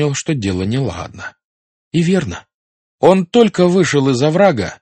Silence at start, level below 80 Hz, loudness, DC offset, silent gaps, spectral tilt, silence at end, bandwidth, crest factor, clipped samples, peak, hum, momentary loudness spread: 0 s; -48 dBFS; -14 LUFS; under 0.1%; 1.44-1.91 s, 2.54-2.98 s; -6 dB/octave; 0.05 s; 8.8 kHz; 16 dB; 0.1%; 0 dBFS; none; 16 LU